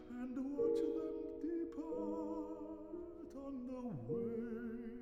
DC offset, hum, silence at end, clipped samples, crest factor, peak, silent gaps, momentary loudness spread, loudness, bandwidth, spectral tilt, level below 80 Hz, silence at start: under 0.1%; none; 0 s; under 0.1%; 16 dB; -26 dBFS; none; 11 LU; -43 LUFS; 9 kHz; -8.5 dB/octave; -66 dBFS; 0 s